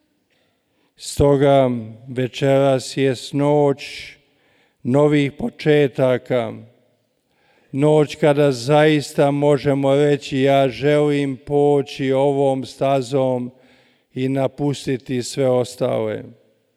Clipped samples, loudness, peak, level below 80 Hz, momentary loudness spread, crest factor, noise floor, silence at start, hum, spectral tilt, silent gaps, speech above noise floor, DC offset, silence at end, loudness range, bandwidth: under 0.1%; -18 LUFS; -4 dBFS; -48 dBFS; 11 LU; 14 dB; -65 dBFS; 1 s; none; -6.5 dB/octave; none; 47 dB; under 0.1%; 0.45 s; 5 LU; 13.5 kHz